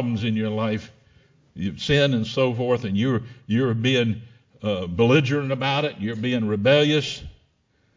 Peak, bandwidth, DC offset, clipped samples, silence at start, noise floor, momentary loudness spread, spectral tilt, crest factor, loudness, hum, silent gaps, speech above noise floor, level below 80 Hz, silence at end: -4 dBFS; 7.6 kHz; under 0.1%; under 0.1%; 0 s; -65 dBFS; 11 LU; -6.5 dB/octave; 18 dB; -22 LUFS; none; none; 43 dB; -50 dBFS; 0.65 s